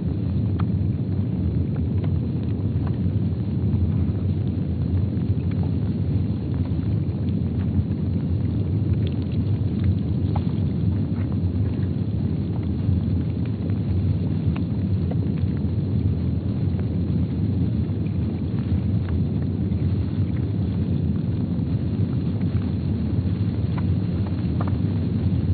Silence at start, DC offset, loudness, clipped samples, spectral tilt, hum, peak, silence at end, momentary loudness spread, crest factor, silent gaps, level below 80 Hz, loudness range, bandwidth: 0 s; under 0.1%; -24 LUFS; under 0.1%; -10 dB/octave; none; -10 dBFS; 0 s; 2 LU; 14 dB; none; -36 dBFS; 1 LU; 4.6 kHz